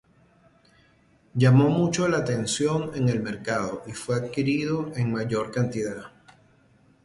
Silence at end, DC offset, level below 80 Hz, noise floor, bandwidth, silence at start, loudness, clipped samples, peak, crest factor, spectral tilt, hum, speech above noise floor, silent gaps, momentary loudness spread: 0.95 s; under 0.1%; -58 dBFS; -60 dBFS; 11.5 kHz; 1.35 s; -25 LUFS; under 0.1%; -6 dBFS; 18 dB; -6 dB/octave; none; 36 dB; none; 12 LU